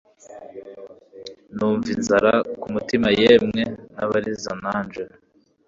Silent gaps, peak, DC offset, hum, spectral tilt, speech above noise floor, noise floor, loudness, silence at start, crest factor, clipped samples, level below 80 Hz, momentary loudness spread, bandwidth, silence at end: none; -2 dBFS; under 0.1%; none; -5 dB/octave; 22 dB; -42 dBFS; -21 LUFS; 0.3 s; 20 dB; under 0.1%; -54 dBFS; 25 LU; 7.6 kHz; 0.6 s